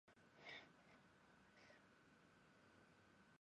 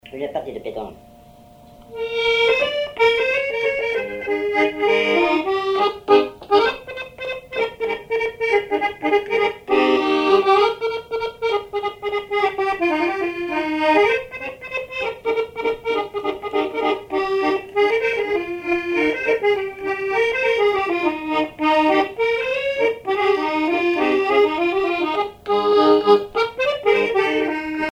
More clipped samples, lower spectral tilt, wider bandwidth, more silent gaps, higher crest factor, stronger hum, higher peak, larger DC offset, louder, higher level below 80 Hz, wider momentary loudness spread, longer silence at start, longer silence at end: neither; about the same, -3.5 dB/octave vs -4.5 dB/octave; about the same, 9.6 kHz vs 9.8 kHz; neither; about the same, 22 dB vs 18 dB; neither; second, -46 dBFS vs -2 dBFS; neither; second, -63 LUFS vs -20 LUFS; second, under -90 dBFS vs -54 dBFS; about the same, 10 LU vs 10 LU; about the same, 0.05 s vs 0.05 s; about the same, 0.05 s vs 0 s